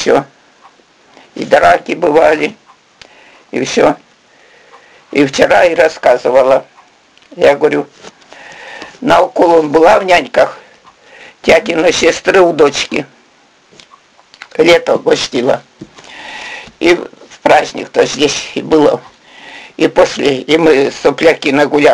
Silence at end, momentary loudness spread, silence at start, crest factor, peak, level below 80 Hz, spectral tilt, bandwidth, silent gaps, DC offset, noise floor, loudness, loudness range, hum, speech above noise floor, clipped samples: 0 s; 17 LU; 0 s; 12 dB; 0 dBFS; -46 dBFS; -4 dB/octave; 12 kHz; none; under 0.1%; -48 dBFS; -11 LUFS; 4 LU; none; 38 dB; 0.3%